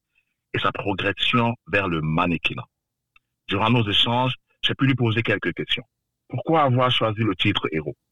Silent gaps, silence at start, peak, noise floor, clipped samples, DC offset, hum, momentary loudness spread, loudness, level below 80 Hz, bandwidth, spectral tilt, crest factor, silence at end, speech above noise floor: none; 0 s; -6 dBFS; -71 dBFS; under 0.1%; 0.6%; none; 8 LU; -22 LUFS; -50 dBFS; 10.5 kHz; -6.5 dB/octave; 16 dB; 0 s; 49 dB